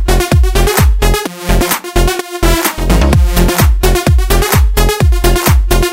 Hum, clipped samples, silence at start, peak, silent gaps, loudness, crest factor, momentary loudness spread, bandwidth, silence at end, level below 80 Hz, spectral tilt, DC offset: none; 0.1%; 0 s; 0 dBFS; none; -11 LUFS; 10 dB; 4 LU; 16.5 kHz; 0 s; -12 dBFS; -5 dB/octave; under 0.1%